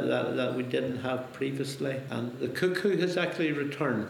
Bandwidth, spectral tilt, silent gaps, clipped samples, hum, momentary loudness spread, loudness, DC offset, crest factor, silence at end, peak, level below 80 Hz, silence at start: 18.5 kHz; -6 dB/octave; none; under 0.1%; none; 6 LU; -30 LUFS; under 0.1%; 18 dB; 0 s; -12 dBFS; -74 dBFS; 0 s